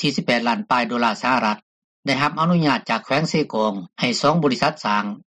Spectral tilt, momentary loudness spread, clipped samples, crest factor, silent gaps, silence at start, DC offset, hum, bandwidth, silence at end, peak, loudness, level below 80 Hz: -5 dB/octave; 6 LU; under 0.1%; 16 dB; 1.62-2.03 s; 0 s; under 0.1%; none; 10 kHz; 0.2 s; -6 dBFS; -20 LUFS; -60 dBFS